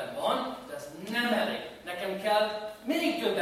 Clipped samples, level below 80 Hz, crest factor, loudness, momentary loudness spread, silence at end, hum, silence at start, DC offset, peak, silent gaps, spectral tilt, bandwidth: under 0.1%; -68 dBFS; 16 dB; -31 LUFS; 11 LU; 0 s; none; 0 s; under 0.1%; -14 dBFS; none; -4 dB/octave; 16 kHz